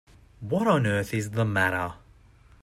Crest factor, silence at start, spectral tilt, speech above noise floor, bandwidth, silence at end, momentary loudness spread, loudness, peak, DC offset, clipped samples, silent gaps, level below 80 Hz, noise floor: 18 dB; 0.4 s; -6 dB/octave; 30 dB; 15.5 kHz; 0.65 s; 10 LU; -26 LUFS; -10 dBFS; under 0.1%; under 0.1%; none; -56 dBFS; -55 dBFS